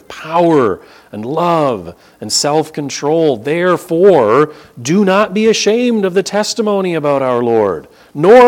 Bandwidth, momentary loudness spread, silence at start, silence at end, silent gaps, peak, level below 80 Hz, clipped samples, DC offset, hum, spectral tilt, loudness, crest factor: 17 kHz; 14 LU; 0.1 s; 0 s; none; 0 dBFS; -54 dBFS; 0.3%; under 0.1%; none; -4.5 dB/octave; -13 LUFS; 12 dB